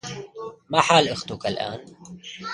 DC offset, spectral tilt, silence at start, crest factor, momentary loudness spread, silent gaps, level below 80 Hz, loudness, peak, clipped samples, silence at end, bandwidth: under 0.1%; -3.5 dB/octave; 0.05 s; 24 dB; 21 LU; none; -58 dBFS; -22 LUFS; 0 dBFS; under 0.1%; 0 s; 11.5 kHz